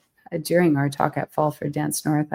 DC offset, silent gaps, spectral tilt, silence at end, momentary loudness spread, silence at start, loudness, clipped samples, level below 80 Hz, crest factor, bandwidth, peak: under 0.1%; none; -6 dB/octave; 0 s; 8 LU; 0.3 s; -23 LUFS; under 0.1%; -64 dBFS; 20 dB; 16.5 kHz; -2 dBFS